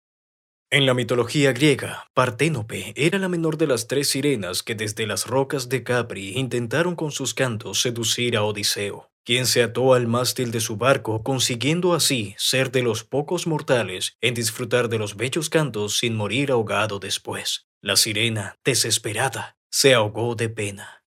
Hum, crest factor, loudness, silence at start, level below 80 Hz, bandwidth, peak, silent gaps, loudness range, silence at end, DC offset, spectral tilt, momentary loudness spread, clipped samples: none; 20 dB; -22 LUFS; 0.7 s; -62 dBFS; 16 kHz; -2 dBFS; 2.10-2.14 s, 9.12-9.24 s, 14.15-14.19 s, 17.64-17.81 s, 19.57-19.70 s; 3 LU; 0.15 s; under 0.1%; -3.5 dB/octave; 8 LU; under 0.1%